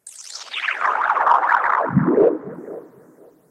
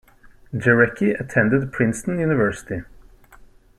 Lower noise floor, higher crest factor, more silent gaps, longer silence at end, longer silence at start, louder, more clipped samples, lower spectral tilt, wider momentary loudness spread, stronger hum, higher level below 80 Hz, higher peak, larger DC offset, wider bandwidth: about the same, -49 dBFS vs -48 dBFS; about the same, 18 dB vs 20 dB; neither; second, 0.65 s vs 0.85 s; second, 0.05 s vs 0.5 s; about the same, -18 LUFS vs -20 LUFS; neither; second, -5.5 dB/octave vs -7 dB/octave; first, 18 LU vs 15 LU; neither; second, -60 dBFS vs -50 dBFS; about the same, -2 dBFS vs -2 dBFS; neither; about the same, 12.5 kHz vs 13.5 kHz